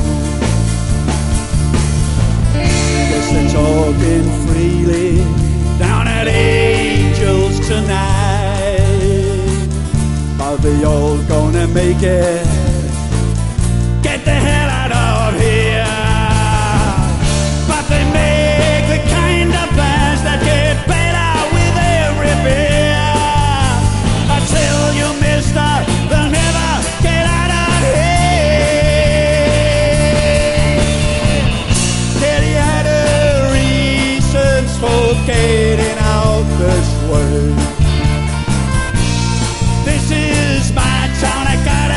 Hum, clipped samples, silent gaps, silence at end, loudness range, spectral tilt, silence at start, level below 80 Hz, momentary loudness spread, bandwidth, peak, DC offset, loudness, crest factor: none; under 0.1%; none; 0 s; 2 LU; -5 dB/octave; 0 s; -18 dBFS; 4 LU; 11.5 kHz; 0 dBFS; 0.9%; -13 LUFS; 12 dB